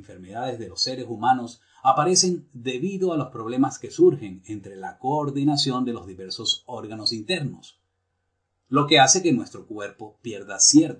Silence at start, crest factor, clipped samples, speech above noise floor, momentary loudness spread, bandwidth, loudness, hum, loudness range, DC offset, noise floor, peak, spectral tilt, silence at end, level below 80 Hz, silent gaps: 0.1 s; 20 dB; under 0.1%; 52 dB; 19 LU; 10.5 kHz; -22 LUFS; none; 4 LU; under 0.1%; -75 dBFS; -4 dBFS; -3 dB/octave; 0 s; -68 dBFS; none